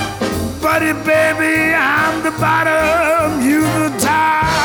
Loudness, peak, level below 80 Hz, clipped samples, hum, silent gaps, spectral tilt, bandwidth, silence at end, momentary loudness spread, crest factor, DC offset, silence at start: -14 LUFS; -2 dBFS; -38 dBFS; under 0.1%; none; none; -4.5 dB/octave; over 20 kHz; 0 s; 4 LU; 12 dB; under 0.1%; 0 s